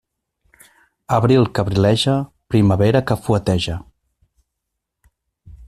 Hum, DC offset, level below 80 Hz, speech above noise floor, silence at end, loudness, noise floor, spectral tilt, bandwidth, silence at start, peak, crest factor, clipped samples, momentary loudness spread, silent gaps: none; under 0.1%; -44 dBFS; 63 dB; 0.05 s; -17 LUFS; -79 dBFS; -7 dB/octave; 14 kHz; 1.1 s; -2 dBFS; 16 dB; under 0.1%; 7 LU; none